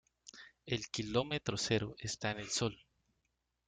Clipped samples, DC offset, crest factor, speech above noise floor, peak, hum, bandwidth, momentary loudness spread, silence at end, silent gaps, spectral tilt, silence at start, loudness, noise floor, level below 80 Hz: under 0.1%; under 0.1%; 20 dB; 46 dB; -18 dBFS; none; 9.6 kHz; 19 LU; 0.95 s; none; -4 dB/octave; 0.25 s; -37 LUFS; -84 dBFS; -64 dBFS